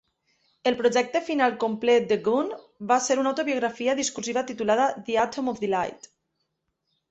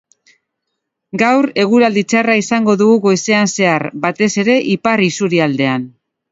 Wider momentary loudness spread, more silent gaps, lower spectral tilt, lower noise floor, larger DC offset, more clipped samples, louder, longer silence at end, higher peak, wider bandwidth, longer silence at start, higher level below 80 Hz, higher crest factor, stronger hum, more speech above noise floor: about the same, 7 LU vs 5 LU; neither; second, -3.5 dB/octave vs -5 dB/octave; about the same, -78 dBFS vs -75 dBFS; neither; neither; second, -25 LUFS vs -13 LUFS; first, 1.15 s vs 0.45 s; second, -8 dBFS vs 0 dBFS; about the same, 8.2 kHz vs 8 kHz; second, 0.65 s vs 1.15 s; second, -68 dBFS vs -60 dBFS; about the same, 18 dB vs 14 dB; neither; second, 53 dB vs 62 dB